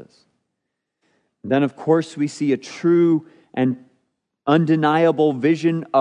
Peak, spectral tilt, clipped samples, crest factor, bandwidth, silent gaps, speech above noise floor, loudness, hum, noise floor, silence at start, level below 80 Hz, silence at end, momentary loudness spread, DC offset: -4 dBFS; -7 dB/octave; under 0.1%; 16 dB; 10 kHz; none; 61 dB; -19 LUFS; none; -79 dBFS; 1.45 s; -76 dBFS; 0 s; 9 LU; under 0.1%